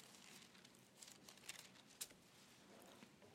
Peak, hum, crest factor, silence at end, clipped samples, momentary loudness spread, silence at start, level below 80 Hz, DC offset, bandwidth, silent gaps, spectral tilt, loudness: -32 dBFS; none; 30 dB; 0 s; under 0.1%; 11 LU; 0 s; under -90 dBFS; under 0.1%; 16 kHz; none; -1.5 dB/octave; -59 LUFS